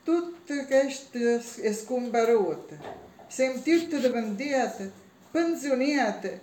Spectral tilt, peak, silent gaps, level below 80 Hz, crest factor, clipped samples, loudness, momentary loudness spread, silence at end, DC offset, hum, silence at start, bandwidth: -4.5 dB/octave; -12 dBFS; none; -72 dBFS; 16 dB; under 0.1%; -27 LUFS; 15 LU; 0 s; under 0.1%; none; 0.05 s; 17 kHz